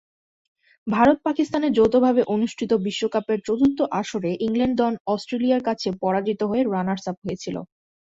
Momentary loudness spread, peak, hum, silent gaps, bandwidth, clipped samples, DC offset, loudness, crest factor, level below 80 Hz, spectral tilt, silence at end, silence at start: 10 LU; -4 dBFS; none; 5.00-5.05 s, 7.17-7.22 s; 7.8 kHz; under 0.1%; under 0.1%; -22 LUFS; 18 dB; -56 dBFS; -6 dB/octave; 0.5 s; 0.85 s